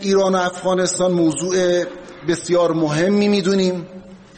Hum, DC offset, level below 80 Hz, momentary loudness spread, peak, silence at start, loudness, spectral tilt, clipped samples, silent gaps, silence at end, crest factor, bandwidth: none; under 0.1%; -54 dBFS; 8 LU; -6 dBFS; 0 s; -18 LUFS; -5 dB/octave; under 0.1%; none; 0.2 s; 12 dB; 8.8 kHz